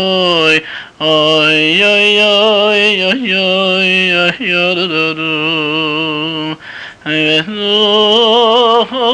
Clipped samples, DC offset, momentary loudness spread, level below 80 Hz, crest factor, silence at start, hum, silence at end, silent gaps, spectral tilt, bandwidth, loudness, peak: under 0.1%; under 0.1%; 9 LU; -56 dBFS; 10 dB; 0 s; none; 0 s; none; -4 dB/octave; 10 kHz; -10 LUFS; -2 dBFS